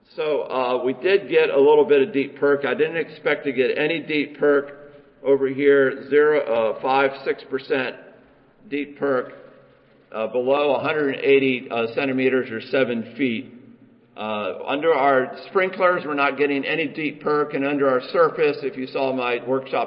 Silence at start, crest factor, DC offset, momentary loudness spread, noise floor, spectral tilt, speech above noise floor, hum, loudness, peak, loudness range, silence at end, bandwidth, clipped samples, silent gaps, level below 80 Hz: 0.15 s; 16 dB; under 0.1%; 9 LU; -54 dBFS; -10 dB/octave; 33 dB; none; -21 LUFS; -6 dBFS; 5 LU; 0 s; 5.4 kHz; under 0.1%; none; -70 dBFS